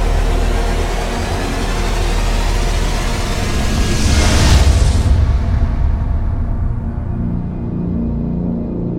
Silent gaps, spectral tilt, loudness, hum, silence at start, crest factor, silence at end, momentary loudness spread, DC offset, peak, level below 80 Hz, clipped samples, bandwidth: none; -5.5 dB/octave; -17 LUFS; none; 0 s; 14 dB; 0 s; 8 LU; under 0.1%; 0 dBFS; -16 dBFS; under 0.1%; 15.5 kHz